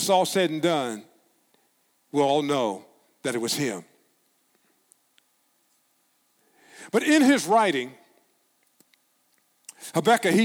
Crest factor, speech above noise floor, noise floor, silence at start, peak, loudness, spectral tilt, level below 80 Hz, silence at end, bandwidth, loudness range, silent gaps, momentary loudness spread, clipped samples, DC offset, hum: 20 dB; 46 dB; -68 dBFS; 0 s; -6 dBFS; -23 LUFS; -4 dB/octave; -76 dBFS; 0 s; 19 kHz; 9 LU; none; 19 LU; under 0.1%; under 0.1%; none